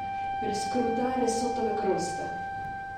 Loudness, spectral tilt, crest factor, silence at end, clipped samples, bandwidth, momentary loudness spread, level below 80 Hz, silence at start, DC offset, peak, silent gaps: -30 LUFS; -4.5 dB/octave; 16 dB; 0 s; under 0.1%; 14 kHz; 7 LU; -56 dBFS; 0 s; under 0.1%; -14 dBFS; none